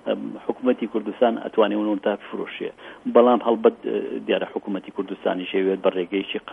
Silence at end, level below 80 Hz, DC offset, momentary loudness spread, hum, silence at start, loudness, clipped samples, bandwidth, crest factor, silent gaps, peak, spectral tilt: 0 s; -70 dBFS; under 0.1%; 12 LU; none; 0.05 s; -23 LUFS; under 0.1%; 3.8 kHz; 20 dB; none; -2 dBFS; -8 dB/octave